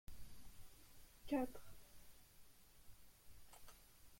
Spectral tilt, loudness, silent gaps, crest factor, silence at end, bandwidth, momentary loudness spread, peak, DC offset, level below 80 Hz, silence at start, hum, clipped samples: -5 dB/octave; -49 LUFS; none; 22 dB; 0 s; 16.5 kHz; 24 LU; -30 dBFS; under 0.1%; -66 dBFS; 0.1 s; none; under 0.1%